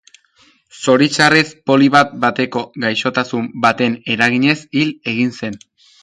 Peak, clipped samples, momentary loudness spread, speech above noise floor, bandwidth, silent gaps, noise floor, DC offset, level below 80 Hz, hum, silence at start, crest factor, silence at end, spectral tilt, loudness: 0 dBFS; under 0.1%; 10 LU; 39 dB; 11.5 kHz; none; -54 dBFS; under 0.1%; -58 dBFS; none; 0.75 s; 16 dB; 0.45 s; -4.5 dB/octave; -15 LUFS